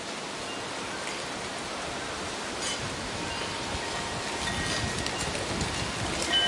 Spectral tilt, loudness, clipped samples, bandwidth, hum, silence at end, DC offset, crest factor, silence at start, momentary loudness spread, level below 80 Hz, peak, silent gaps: -2.5 dB/octave; -31 LUFS; under 0.1%; 11.5 kHz; none; 0 s; under 0.1%; 22 dB; 0 s; 5 LU; -48 dBFS; -10 dBFS; none